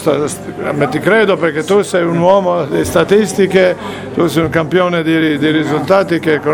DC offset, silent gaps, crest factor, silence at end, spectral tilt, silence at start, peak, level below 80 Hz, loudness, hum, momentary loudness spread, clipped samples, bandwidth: under 0.1%; none; 12 dB; 0 s; -5.5 dB/octave; 0 s; 0 dBFS; -44 dBFS; -13 LUFS; none; 6 LU; under 0.1%; 17.5 kHz